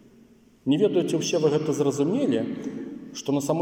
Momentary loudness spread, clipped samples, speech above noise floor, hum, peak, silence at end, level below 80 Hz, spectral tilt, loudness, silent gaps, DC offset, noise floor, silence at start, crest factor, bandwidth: 12 LU; under 0.1%; 31 dB; none; -10 dBFS; 0 s; -68 dBFS; -5.5 dB/octave; -25 LUFS; none; under 0.1%; -55 dBFS; 0.65 s; 16 dB; 16.5 kHz